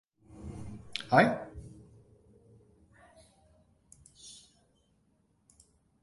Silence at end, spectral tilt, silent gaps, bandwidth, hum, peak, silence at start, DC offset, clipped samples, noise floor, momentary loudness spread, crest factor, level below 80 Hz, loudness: 1.7 s; -5.5 dB/octave; none; 11.5 kHz; none; -8 dBFS; 0.35 s; under 0.1%; under 0.1%; -71 dBFS; 27 LU; 28 dB; -60 dBFS; -29 LUFS